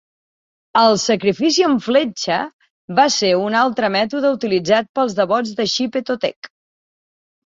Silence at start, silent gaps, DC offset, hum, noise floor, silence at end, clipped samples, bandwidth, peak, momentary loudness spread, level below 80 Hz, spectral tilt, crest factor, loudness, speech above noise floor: 0.75 s; 2.53-2.59 s, 2.70-2.88 s, 4.89-4.94 s, 6.36-6.42 s; under 0.1%; none; under -90 dBFS; 1 s; under 0.1%; 7.8 kHz; -2 dBFS; 7 LU; -62 dBFS; -3.5 dB/octave; 16 dB; -17 LUFS; over 73 dB